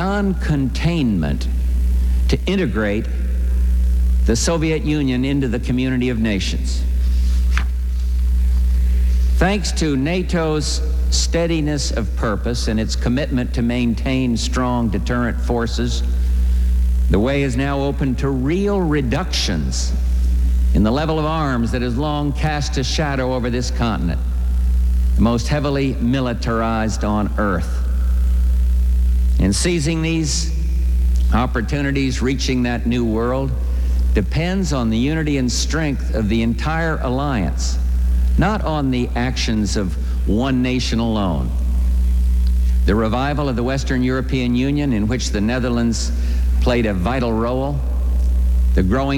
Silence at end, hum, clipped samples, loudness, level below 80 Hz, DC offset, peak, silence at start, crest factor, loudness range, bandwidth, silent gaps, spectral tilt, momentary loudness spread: 0 s; none; under 0.1%; -19 LUFS; -20 dBFS; under 0.1%; -2 dBFS; 0 s; 14 dB; 1 LU; 16.5 kHz; none; -6 dB/octave; 3 LU